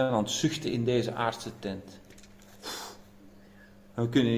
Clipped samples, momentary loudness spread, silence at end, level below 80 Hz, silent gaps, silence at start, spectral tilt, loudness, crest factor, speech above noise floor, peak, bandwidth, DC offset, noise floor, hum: under 0.1%; 18 LU; 0 s; -60 dBFS; none; 0 s; -5 dB/octave; -31 LUFS; 20 dB; 25 dB; -12 dBFS; 16 kHz; under 0.1%; -54 dBFS; none